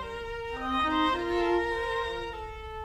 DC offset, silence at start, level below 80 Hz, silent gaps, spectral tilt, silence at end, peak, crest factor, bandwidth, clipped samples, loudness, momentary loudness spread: under 0.1%; 0 s; -46 dBFS; none; -5 dB/octave; 0 s; -16 dBFS; 14 dB; 13 kHz; under 0.1%; -30 LUFS; 11 LU